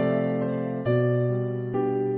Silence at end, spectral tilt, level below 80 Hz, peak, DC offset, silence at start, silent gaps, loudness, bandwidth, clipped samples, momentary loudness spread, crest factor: 0 s; -12 dB/octave; -62 dBFS; -12 dBFS; under 0.1%; 0 s; none; -26 LUFS; 3.8 kHz; under 0.1%; 5 LU; 12 dB